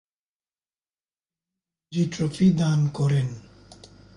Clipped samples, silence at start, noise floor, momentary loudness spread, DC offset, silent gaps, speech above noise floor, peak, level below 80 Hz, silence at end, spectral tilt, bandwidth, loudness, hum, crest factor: under 0.1%; 1.9 s; under -90 dBFS; 12 LU; under 0.1%; none; over 68 dB; -10 dBFS; -58 dBFS; 0.75 s; -7.5 dB/octave; 11 kHz; -24 LUFS; none; 16 dB